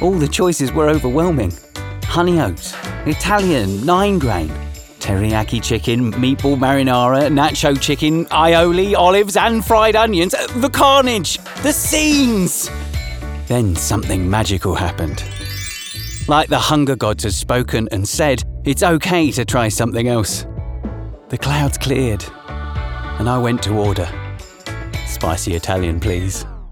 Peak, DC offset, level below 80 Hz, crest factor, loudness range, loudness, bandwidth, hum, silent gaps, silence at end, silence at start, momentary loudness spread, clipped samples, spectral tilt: 0 dBFS; under 0.1%; -30 dBFS; 16 dB; 7 LU; -16 LUFS; over 20 kHz; none; none; 0 s; 0 s; 13 LU; under 0.1%; -4.5 dB/octave